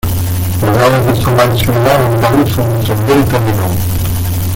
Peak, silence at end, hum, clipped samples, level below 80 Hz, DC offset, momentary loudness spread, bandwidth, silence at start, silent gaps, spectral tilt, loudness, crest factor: 0 dBFS; 0 s; none; under 0.1%; -28 dBFS; under 0.1%; 5 LU; 17 kHz; 0.05 s; none; -6 dB/octave; -11 LUFS; 10 dB